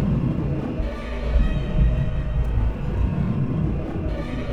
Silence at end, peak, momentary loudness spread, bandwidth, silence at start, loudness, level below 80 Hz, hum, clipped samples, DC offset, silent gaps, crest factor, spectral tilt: 0 s; -8 dBFS; 6 LU; 5.6 kHz; 0 s; -25 LUFS; -24 dBFS; none; under 0.1%; under 0.1%; none; 14 dB; -9 dB/octave